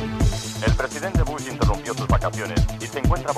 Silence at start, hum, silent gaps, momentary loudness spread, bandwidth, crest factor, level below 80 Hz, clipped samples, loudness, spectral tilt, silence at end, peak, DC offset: 0 s; none; none; 3 LU; 14.5 kHz; 16 dB; -26 dBFS; under 0.1%; -24 LUFS; -5.5 dB/octave; 0 s; -4 dBFS; under 0.1%